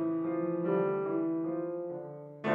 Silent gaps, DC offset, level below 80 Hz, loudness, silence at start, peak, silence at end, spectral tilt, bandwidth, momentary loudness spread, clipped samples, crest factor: none; under 0.1%; -86 dBFS; -33 LUFS; 0 s; -18 dBFS; 0 s; -9.5 dB/octave; 3.8 kHz; 10 LU; under 0.1%; 16 dB